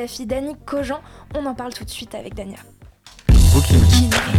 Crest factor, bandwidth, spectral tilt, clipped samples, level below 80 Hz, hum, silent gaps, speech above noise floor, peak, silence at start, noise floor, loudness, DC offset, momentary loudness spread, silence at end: 12 dB; 16 kHz; -5 dB/octave; under 0.1%; -22 dBFS; none; none; 26 dB; -4 dBFS; 0 s; -45 dBFS; -17 LUFS; under 0.1%; 19 LU; 0 s